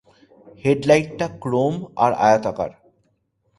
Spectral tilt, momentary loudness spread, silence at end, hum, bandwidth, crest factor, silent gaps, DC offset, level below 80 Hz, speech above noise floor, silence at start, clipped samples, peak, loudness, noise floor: -6 dB/octave; 11 LU; 0.9 s; none; 11.5 kHz; 20 dB; none; under 0.1%; -56 dBFS; 48 dB; 0.45 s; under 0.1%; -2 dBFS; -20 LUFS; -67 dBFS